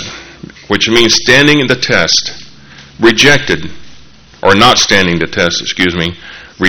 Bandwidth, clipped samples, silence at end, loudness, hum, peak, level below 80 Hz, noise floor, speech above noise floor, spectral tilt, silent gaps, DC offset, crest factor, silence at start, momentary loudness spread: over 20 kHz; 1%; 0 s; -9 LUFS; none; 0 dBFS; -38 dBFS; -38 dBFS; 29 dB; -3 dB/octave; none; under 0.1%; 12 dB; 0 s; 12 LU